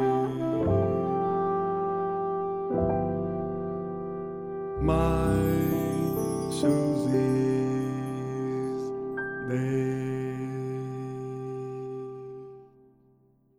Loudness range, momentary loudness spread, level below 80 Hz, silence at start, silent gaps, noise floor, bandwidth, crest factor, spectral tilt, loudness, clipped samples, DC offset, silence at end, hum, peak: 6 LU; 11 LU; -44 dBFS; 0 s; none; -63 dBFS; 16 kHz; 16 dB; -7.5 dB/octave; -29 LUFS; under 0.1%; under 0.1%; 0.9 s; none; -12 dBFS